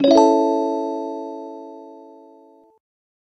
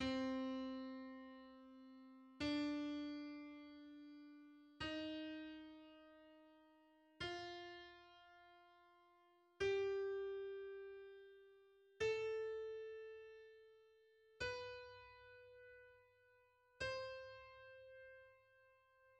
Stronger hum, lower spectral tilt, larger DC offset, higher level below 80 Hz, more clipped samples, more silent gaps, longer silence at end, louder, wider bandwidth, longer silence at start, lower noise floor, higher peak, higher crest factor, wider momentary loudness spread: neither; about the same, -4.5 dB/octave vs -5 dB/octave; neither; first, -66 dBFS vs -74 dBFS; neither; neither; first, 1.25 s vs 0 s; first, -19 LUFS vs -48 LUFS; second, 8.2 kHz vs 9.4 kHz; about the same, 0 s vs 0 s; second, -50 dBFS vs -75 dBFS; first, -2 dBFS vs -32 dBFS; about the same, 20 dB vs 18 dB; first, 25 LU vs 22 LU